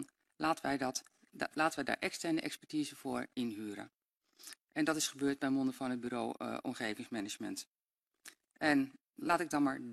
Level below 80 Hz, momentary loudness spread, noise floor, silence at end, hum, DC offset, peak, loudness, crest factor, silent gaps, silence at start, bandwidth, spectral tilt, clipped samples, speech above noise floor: -74 dBFS; 18 LU; -89 dBFS; 0 s; none; under 0.1%; -16 dBFS; -37 LUFS; 22 dB; 7.67-7.74 s, 8.07-8.11 s; 0 s; 14 kHz; -3.5 dB/octave; under 0.1%; 52 dB